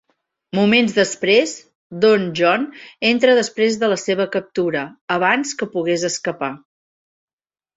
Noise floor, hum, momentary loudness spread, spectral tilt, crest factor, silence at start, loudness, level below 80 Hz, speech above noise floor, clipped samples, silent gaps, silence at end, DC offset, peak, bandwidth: under -90 dBFS; none; 11 LU; -4 dB/octave; 18 dB; 0.55 s; -18 LUFS; -62 dBFS; over 72 dB; under 0.1%; 1.75-1.90 s, 5.01-5.08 s; 1.2 s; under 0.1%; -2 dBFS; 8 kHz